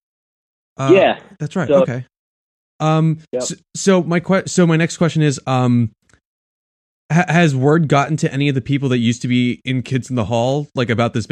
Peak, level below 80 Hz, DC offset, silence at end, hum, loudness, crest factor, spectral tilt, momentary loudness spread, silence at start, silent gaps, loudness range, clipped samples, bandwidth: 0 dBFS; -54 dBFS; under 0.1%; 0.05 s; none; -17 LUFS; 16 dB; -6 dB/octave; 9 LU; 0.8 s; 2.19-2.79 s, 6.25-7.09 s; 2 LU; under 0.1%; 10.5 kHz